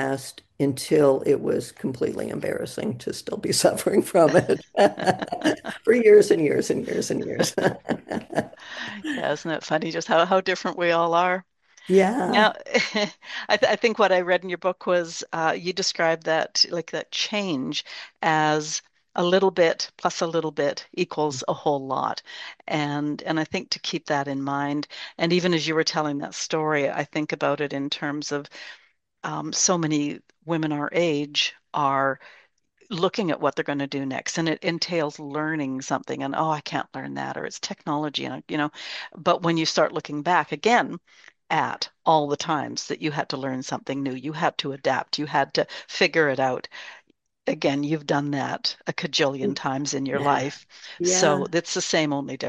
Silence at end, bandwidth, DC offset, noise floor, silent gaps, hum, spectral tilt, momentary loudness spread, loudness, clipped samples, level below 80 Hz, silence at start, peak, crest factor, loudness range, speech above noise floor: 0 s; 12.5 kHz; under 0.1%; -61 dBFS; none; none; -4 dB/octave; 10 LU; -24 LUFS; under 0.1%; -68 dBFS; 0 s; -4 dBFS; 20 dB; 5 LU; 37 dB